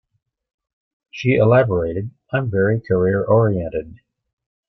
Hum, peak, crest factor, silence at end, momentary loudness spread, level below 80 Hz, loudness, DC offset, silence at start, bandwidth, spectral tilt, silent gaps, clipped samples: none; -4 dBFS; 16 dB; 0.75 s; 13 LU; -48 dBFS; -18 LUFS; under 0.1%; 1.15 s; 6.2 kHz; -9 dB/octave; none; under 0.1%